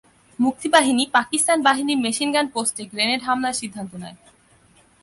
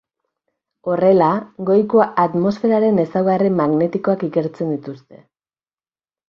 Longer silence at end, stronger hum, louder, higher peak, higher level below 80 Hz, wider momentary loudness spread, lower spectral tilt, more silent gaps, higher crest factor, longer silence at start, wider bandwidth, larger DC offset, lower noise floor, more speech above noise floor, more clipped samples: second, 0.9 s vs 1.1 s; neither; second, -20 LUFS vs -17 LUFS; about the same, -4 dBFS vs -2 dBFS; about the same, -64 dBFS vs -62 dBFS; first, 15 LU vs 9 LU; second, -2 dB/octave vs -9.5 dB/octave; neither; about the same, 18 dB vs 16 dB; second, 0.4 s vs 0.85 s; first, 12 kHz vs 6.8 kHz; neither; second, -55 dBFS vs under -90 dBFS; second, 35 dB vs over 73 dB; neither